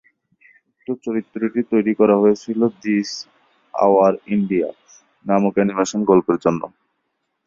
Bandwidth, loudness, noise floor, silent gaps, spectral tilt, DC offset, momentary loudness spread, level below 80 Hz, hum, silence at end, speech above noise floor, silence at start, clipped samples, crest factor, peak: 7.6 kHz; -19 LUFS; -73 dBFS; none; -6.5 dB/octave; under 0.1%; 14 LU; -60 dBFS; none; 0.8 s; 55 dB; 0.9 s; under 0.1%; 18 dB; -2 dBFS